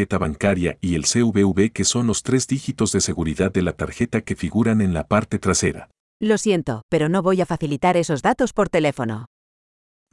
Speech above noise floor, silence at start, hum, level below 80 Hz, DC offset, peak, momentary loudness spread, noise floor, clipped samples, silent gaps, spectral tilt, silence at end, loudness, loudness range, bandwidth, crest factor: over 70 dB; 0 s; none; -46 dBFS; under 0.1%; -2 dBFS; 6 LU; under -90 dBFS; under 0.1%; 6.00-6.20 s, 6.83-6.89 s; -5 dB/octave; 0.85 s; -20 LUFS; 1 LU; 12 kHz; 18 dB